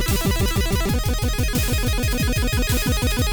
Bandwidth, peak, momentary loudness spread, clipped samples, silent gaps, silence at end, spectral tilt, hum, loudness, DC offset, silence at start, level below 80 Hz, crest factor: over 20 kHz; -8 dBFS; 2 LU; under 0.1%; none; 0 s; -4.5 dB/octave; none; -21 LUFS; under 0.1%; 0 s; -24 dBFS; 12 dB